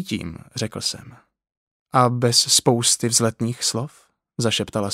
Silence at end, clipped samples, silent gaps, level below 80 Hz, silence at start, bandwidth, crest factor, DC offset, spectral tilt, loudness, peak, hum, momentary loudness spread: 0 s; under 0.1%; 1.57-1.86 s; -56 dBFS; 0 s; 16 kHz; 22 dB; under 0.1%; -3 dB/octave; -20 LUFS; -2 dBFS; none; 15 LU